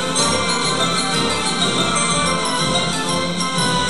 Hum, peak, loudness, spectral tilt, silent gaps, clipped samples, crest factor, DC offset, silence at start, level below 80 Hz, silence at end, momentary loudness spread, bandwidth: none; -4 dBFS; -17 LUFS; -2.5 dB/octave; none; under 0.1%; 16 dB; 2%; 0 s; -42 dBFS; 0 s; 3 LU; 11.5 kHz